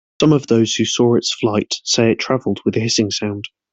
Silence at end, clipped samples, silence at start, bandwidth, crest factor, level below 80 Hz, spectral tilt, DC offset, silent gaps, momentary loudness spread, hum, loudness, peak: 0.25 s; under 0.1%; 0.2 s; 8.4 kHz; 14 dB; -54 dBFS; -4.5 dB/octave; under 0.1%; none; 5 LU; none; -17 LUFS; -2 dBFS